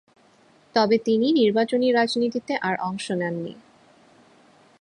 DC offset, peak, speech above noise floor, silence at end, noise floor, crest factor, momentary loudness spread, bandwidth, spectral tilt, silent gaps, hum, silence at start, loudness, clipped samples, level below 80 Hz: under 0.1%; -6 dBFS; 35 dB; 1.3 s; -57 dBFS; 18 dB; 8 LU; 11 kHz; -5.5 dB/octave; none; none; 0.75 s; -22 LUFS; under 0.1%; -70 dBFS